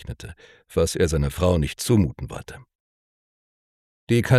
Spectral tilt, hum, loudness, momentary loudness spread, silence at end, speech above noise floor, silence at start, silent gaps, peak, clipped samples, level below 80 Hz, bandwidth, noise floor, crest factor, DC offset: -6 dB/octave; none; -22 LUFS; 17 LU; 0 s; over 68 dB; 0 s; 2.75-4.07 s; -4 dBFS; under 0.1%; -36 dBFS; 14.5 kHz; under -90 dBFS; 20 dB; under 0.1%